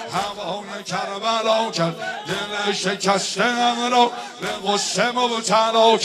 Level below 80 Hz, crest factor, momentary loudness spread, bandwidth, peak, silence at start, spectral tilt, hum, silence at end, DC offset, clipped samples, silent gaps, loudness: -64 dBFS; 18 dB; 10 LU; 14 kHz; -2 dBFS; 0 s; -3 dB/octave; none; 0 s; under 0.1%; under 0.1%; none; -21 LUFS